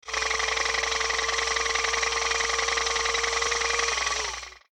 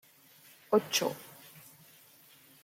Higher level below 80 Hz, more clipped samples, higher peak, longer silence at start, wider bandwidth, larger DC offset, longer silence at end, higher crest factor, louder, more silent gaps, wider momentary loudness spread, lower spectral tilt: first, -46 dBFS vs -82 dBFS; neither; about the same, -12 dBFS vs -14 dBFS; second, 0.05 s vs 0.7 s; about the same, 17.5 kHz vs 16.5 kHz; neither; second, 0.15 s vs 1.35 s; second, 16 dB vs 22 dB; first, -24 LUFS vs -30 LUFS; neither; second, 2 LU vs 25 LU; second, 0.5 dB/octave vs -3 dB/octave